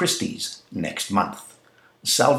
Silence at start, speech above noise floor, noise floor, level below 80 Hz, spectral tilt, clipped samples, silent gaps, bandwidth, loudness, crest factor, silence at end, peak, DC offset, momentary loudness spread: 0 s; 33 dB; -56 dBFS; -62 dBFS; -3 dB/octave; under 0.1%; none; 16.5 kHz; -25 LUFS; 20 dB; 0 s; -4 dBFS; under 0.1%; 12 LU